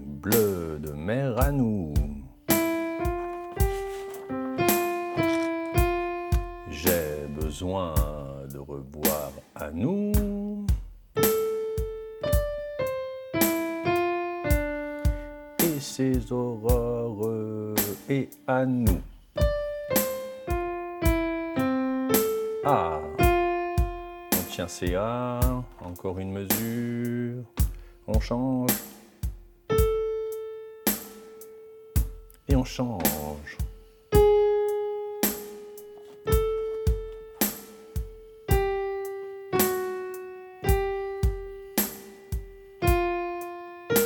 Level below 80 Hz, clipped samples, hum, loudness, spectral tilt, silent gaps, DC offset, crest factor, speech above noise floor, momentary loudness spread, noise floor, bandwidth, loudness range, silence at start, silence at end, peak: -34 dBFS; under 0.1%; none; -28 LUFS; -5.5 dB/octave; none; under 0.1%; 20 dB; 20 dB; 13 LU; -47 dBFS; 19 kHz; 4 LU; 0 s; 0 s; -8 dBFS